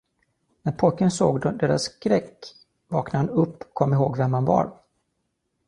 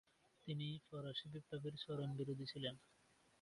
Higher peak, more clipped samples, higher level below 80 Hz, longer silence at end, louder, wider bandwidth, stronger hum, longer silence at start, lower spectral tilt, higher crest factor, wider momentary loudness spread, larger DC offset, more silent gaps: first, -4 dBFS vs -30 dBFS; neither; first, -56 dBFS vs -80 dBFS; first, 0.95 s vs 0.6 s; first, -23 LUFS vs -48 LUFS; about the same, 11 kHz vs 11.5 kHz; neither; first, 0.65 s vs 0.45 s; about the same, -7 dB/octave vs -7 dB/octave; about the same, 20 dB vs 20 dB; first, 11 LU vs 5 LU; neither; neither